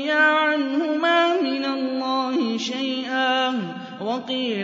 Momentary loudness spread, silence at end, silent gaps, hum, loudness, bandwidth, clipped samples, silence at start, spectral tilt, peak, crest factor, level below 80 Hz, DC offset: 10 LU; 0 s; none; none; -22 LUFS; 7.6 kHz; under 0.1%; 0 s; -4 dB/octave; -6 dBFS; 16 dB; -76 dBFS; under 0.1%